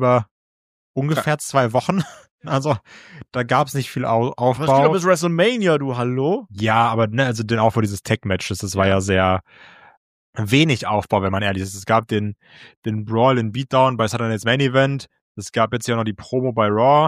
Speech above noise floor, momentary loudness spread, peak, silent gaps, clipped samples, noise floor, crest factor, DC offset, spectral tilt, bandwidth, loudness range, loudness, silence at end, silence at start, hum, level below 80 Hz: over 71 dB; 10 LU; -2 dBFS; 0.31-0.94 s, 2.31-2.38 s, 9.97-10.33 s, 12.77-12.82 s, 15.21-15.35 s; under 0.1%; under -90 dBFS; 18 dB; under 0.1%; -5.5 dB/octave; 15.5 kHz; 3 LU; -19 LUFS; 0 s; 0 s; none; -54 dBFS